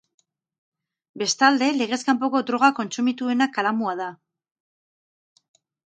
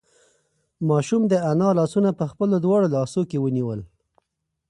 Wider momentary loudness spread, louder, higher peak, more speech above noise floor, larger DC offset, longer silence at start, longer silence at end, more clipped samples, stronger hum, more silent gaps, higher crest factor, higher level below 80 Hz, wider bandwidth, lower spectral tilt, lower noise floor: about the same, 9 LU vs 7 LU; about the same, -22 LUFS vs -22 LUFS; first, -2 dBFS vs -8 dBFS; first, over 68 dB vs 58 dB; neither; first, 1.15 s vs 0.8 s; first, 1.7 s vs 0.85 s; neither; neither; neither; first, 22 dB vs 16 dB; second, -78 dBFS vs -60 dBFS; second, 9.2 kHz vs 11.5 kHz; second, -3 dB/octave vs -8 dB/octave; first, under -90 dBFS vs -79 dBFS